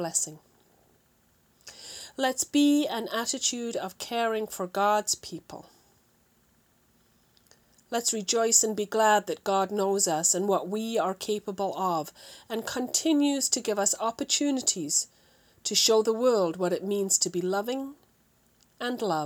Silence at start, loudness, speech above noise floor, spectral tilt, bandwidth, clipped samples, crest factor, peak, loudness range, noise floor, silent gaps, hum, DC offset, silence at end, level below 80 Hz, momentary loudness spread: 0 s; -26 LUFS; 39 dB; -2.5 dB/octave; over 20 kHz; under 0.1%; 20 dB; -8 dBFS; 6 LU; -66 dBFS; none; none; under 0.1%; 0 s; -72 dBFS; 13 LU